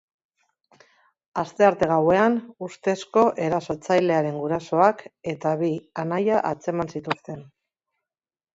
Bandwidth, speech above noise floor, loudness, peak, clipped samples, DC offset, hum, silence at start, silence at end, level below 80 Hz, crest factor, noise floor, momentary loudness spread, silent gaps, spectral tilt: 8 kHz; over 67 dB; -23 LUFS; -4 dBFS; under 0.1%; under 0.1%; none; 1.35 s; 1.1 s; -62 dBFS; 20 dB; under -90 dBFS; 11 LU; none; -6.5 dB/octave